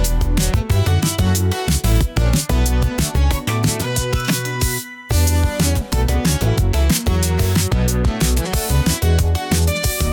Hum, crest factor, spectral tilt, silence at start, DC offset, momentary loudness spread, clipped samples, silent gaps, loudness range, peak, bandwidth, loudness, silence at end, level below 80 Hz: none; 12 dB; -5 dB/octave; 0 s; under 0.1%; 3 LU; under 0.1%; none; 1 LU; -4 dBFS; over 20 kHz; -18 LUFS; 0 s; -20 dBFS